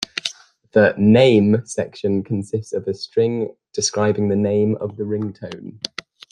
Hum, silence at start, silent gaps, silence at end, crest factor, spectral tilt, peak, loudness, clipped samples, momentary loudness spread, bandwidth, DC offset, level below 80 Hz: none; 0.15 s; none; 0.55 s; 18 dB; -5.5 dB/octave; -2 dBFS; -19 LUFS; under 0.1%; 16 LU; 11 kHz; under 0.1%; -58 dBFS